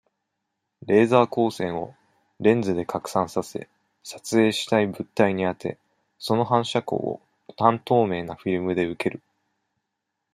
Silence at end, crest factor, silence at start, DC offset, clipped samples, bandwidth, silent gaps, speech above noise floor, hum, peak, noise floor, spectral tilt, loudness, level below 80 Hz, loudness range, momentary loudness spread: 1.15 s; 22 dB; 0.85 s; under 0.1%; under 0.1%; 15.5 kHz; none; 58 dB; none; -2 dBFS; -81 dBFS; -6 dB/octave; -23 LUFS; -64 dBFS; 2 LU; 16 LU